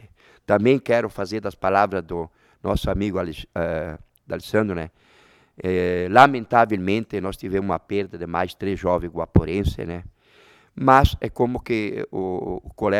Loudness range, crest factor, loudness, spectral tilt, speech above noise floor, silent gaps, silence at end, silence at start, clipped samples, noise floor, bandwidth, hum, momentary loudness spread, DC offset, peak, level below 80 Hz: 6 LU; 22 dB; -22 LUFS; -7 dB/octave; 33 dB; none; 0 s; 0.05 s; under 0.1%; -54 dBFS; 16 kHz; none; 15 LU; under 0.1%; 0 dBFS; -36 dBFS